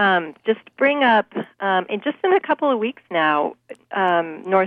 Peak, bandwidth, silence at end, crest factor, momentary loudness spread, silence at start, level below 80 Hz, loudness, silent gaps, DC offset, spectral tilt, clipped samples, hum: -4 dBFS; 5.4 kHz; 0 s; 16 dB; 8 LU; 0 s; -76 dBFS; -20 LUFS; none; under 0.1%; -7 dB/octave; under 0.1%; none